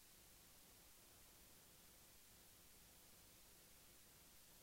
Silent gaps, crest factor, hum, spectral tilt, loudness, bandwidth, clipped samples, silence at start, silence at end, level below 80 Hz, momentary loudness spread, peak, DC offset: none; 12 dB; 50 Hz at -80 dBFS; -2 dB/octave; -65 LUFS; 16 kHz; under 0.1%; 0 s; 0 s; -78 dBFS; 0 LU; -54 dBFS; under 0.1%